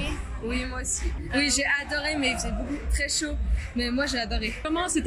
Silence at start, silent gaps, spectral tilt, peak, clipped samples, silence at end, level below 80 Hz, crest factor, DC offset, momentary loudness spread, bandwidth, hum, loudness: 0 s; none; -3 dB/octave; -12 dBFS; under 0.1%; 0 s; -32 dBFS; 16 dB; under 0.1%; 7 LU; 13 kHz; none; -27 LUFS